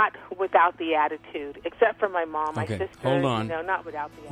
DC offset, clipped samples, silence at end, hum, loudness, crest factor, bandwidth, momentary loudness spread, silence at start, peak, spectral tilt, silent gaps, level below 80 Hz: under 0.1%; under 0.1%; 0 s; none; -26 LUFS; 18 dB; 12 kHz; 13 LU; 0 s; -6 dBFS; -6.5 dB/octave; none; -60 dBFS